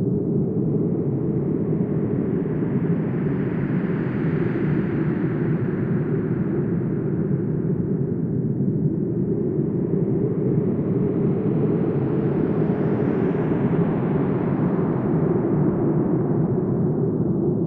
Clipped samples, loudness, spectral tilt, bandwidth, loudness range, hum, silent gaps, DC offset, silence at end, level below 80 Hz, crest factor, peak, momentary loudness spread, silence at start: under 0.1%; -22 LUFS; -12.5 dB/octave; 3.6 kHz; 2 LU; none; none; under 0.1%; 0 s; -48 dBFS; 12 dB; -8 dBFS; 2 LU; 0 s